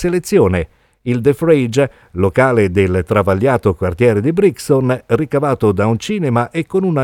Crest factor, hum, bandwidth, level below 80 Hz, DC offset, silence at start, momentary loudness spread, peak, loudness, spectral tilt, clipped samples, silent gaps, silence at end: 14 dB; none; 17 kHz; -40 dBFS; under 0.1%; 0 s; 5 LU; 0 dBFS; -15 LUFS; -7 dB/octave; under 0.1%; none; 0 s